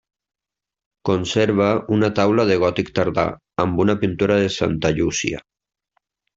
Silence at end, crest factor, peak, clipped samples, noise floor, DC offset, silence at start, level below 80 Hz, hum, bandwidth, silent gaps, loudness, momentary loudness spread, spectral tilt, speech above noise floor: 0.95 s; 18 dB; -2 dBFS; under 0.1%; -88 dBFS; under 0.1%; 1.05 s; -48 dBFS; none; 7.8 kHz; none; -19 LUFS; 6 LU; -5.5 dB/octave; 69 dB